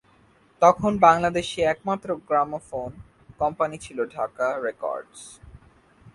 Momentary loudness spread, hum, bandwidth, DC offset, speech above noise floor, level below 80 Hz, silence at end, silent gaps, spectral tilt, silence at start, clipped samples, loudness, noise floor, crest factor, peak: 16 LU; none; 11.5 kHz; under 0.1%; 35 dB; -54 dBFS; 0.05 s; none; -5 dB/octave; 0.6 s; under 0.1%; -23 LUFS; -58 dBFS; 24 dB; -2 dBFS